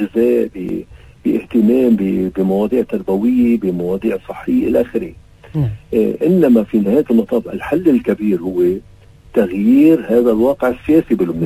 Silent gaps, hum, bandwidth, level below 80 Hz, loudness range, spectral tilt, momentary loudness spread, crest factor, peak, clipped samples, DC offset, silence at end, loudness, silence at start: none; none; 15.5 kHz; -42 dBFS; 3 LU; -9 dB/octave; 9 LU; 14 dB; 0 dBFS; under 0.1%; under 0.1%; 0 s; -15 LUFS; 0 s